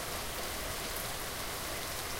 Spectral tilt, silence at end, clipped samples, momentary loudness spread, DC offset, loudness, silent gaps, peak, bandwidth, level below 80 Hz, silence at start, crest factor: -2 dB/octave; 0 s; under 0.1%; 1 LU; under 0.1%; -37 LUFS; none; -18 dBFS; 17 kHz; -48 dBFS; 0 s; 20 dB